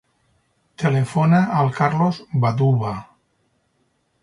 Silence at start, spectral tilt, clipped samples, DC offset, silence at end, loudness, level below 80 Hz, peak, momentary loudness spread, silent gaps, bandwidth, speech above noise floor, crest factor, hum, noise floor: 0.8 s; -8 dB/octave; under 0.1%; under 0.1%; 1.2 s; -19 LUFS; -56 dBFS; -4 dBFS; 7 LU; none; 11.5 kHz; 49 dB; 18 dB; none; -67 dBFS